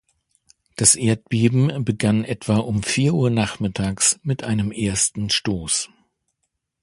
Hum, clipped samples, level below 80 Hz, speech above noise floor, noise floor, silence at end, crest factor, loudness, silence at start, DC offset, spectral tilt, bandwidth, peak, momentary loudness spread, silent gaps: none; under 0.1%; -46 dBFS; 56 dB; -76 dBFS; 0.95 s; 22 dB; -20 LUFS; 0.8 s; under 0.1%; -4 dB/octave; 11.5 kHz; 0 dBFS; 7 LU; none